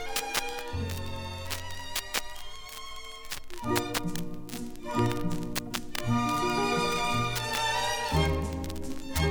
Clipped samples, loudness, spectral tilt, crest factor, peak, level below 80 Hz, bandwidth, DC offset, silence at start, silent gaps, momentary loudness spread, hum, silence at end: under 0.1%; -31 LUFS; -4 dB/octave; 22 dB; -8 dBFS; -42 dBFS; over 20 kHz; under 0.1%; 0 s; none; 12 LU; none; 0 s